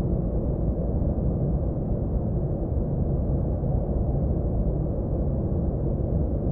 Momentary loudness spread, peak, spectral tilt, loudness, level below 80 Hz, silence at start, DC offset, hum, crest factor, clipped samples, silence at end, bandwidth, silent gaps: 2 LU; -12 dBFS; -15 dB/octave; -27 LUFS; -28 dBFS; 0 s; under 0.1%; none; 12 dB; under 0.1%; 0 s; 1.9 kHz; none